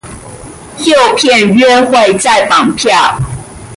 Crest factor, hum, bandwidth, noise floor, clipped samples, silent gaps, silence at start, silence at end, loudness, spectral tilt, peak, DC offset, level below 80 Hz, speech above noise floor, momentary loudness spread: 10 dB; none; 11.5 kHz; -28 dBFS; under 0.1%; none; 0.05 s; 0 s; -8 LUFS; -3.5 dB/octave; 0 dBFS; under 0.1%; -38 dBFS; 21 dB; 21 LU